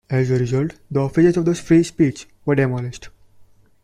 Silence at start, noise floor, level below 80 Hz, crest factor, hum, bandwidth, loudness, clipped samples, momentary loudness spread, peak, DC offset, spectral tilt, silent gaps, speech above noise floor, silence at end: 0.1 s; -49 dBFS; -48 dBFS; 16 dB; none; 11 kHz; -19 LUFS; under 0.1%; 11 LU; -4 dBFS; under 0.1%; -7.5 dB/octave; none; 31 dB; 0.4 s